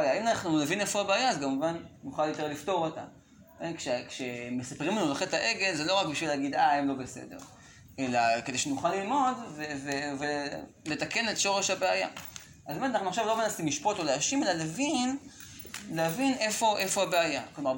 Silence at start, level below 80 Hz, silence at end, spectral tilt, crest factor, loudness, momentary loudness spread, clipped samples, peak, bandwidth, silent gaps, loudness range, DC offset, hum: 0 s; -66 dBFS; 0 s; -3 dB/octave; 18 dB; -30 LUFS; 13 LU; under 0.1%; -12 dBFS; 17 kHz; none; 3 LU; under 0.1%; none